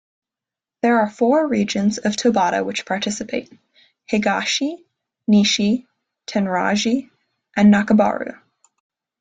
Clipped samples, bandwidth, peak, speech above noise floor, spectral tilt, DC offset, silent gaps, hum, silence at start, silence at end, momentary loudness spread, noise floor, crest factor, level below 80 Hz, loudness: under 0.1%; 9 kHz; -4 dBFS; 70 dB; -4.5 dB/octave; under 0.1%; none; none; 0.85 s; 0.85 s; 13 LU; -88 dBFS; 16 dB; -60 dBFS; -19 LUFS